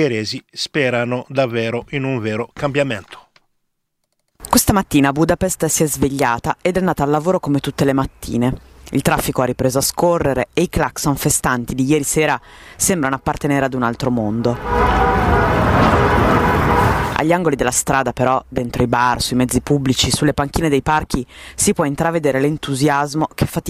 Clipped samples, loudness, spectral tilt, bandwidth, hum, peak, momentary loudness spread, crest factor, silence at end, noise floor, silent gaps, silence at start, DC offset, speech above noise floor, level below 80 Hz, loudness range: under 0.1%; -17 LUFS; -4.5 dB/octave; 16 kHz; none; 0 dBFS; 7 LU; 16 dB; 0 s; -71 dBFS; none; 0 s; under 0.1%; 53 dB; -32 dBFS; 4 LU